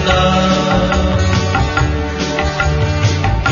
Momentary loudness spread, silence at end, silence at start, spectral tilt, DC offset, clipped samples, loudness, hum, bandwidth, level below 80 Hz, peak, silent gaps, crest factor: 5 LU; 0 s; 0 s; -5.5 dB/octave; under 0.1%; under 0.1%; -14 LUFS; none; 7.4 kHz; -22 dBFS; -2 dBFS; none; 12 dB